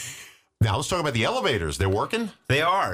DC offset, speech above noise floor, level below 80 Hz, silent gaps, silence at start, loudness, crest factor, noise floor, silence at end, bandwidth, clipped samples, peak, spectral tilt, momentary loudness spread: under 0.1%; 22 dB; -44 dBFS; none; 0 s; -24 LUFS; 12 dB; -46 dBFS; 0 s; 15.5 kHz; under 0.1%; -12 dBFS; -4.5 dB/octave; 7 LU